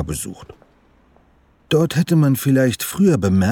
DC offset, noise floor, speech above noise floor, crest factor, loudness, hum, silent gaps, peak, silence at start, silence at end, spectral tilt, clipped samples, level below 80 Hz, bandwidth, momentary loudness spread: under 0.1%; -55 dBFS; 38 dB; 12 dB; -17 LUFS; none; none; -6 dBFS; 0 s; 0 s; -6 dB/octave; under 0.1%; -46 dBFS; 19 kHz; 10 LU